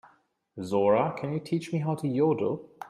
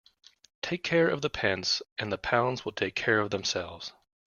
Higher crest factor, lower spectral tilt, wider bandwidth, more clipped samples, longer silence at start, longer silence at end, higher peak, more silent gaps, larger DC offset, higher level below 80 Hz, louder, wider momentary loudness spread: second, 16 dB vs 22 dB; first, -8 dB/octave vs -4 dB/octave; first, 12.5 kHz vs 7.2 kHz; neither; about the same, 0.55 s vs 0.65 s; second, 0 s vs 0.35 s; second, -12 dBFS vs -8 dBFS; second, none vs 1.92-1.96 s; neither; second, -70 dBFS vs -60 dBFS; about the same, -28 LUFS vs -29 LUFS; about the same, 9 LU vs 11 LU